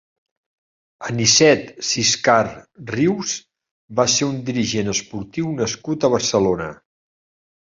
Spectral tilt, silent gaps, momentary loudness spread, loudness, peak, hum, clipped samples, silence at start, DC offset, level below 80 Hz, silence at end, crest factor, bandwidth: -3 dB/octave; 3.71-3.88 s; 13 LU; -19 LUFS; -2 dBFS; none; under 0.1%; 1 s; under 0.1%; -52 dBFS; 1.05 s; 20 dB; 7.8 kHz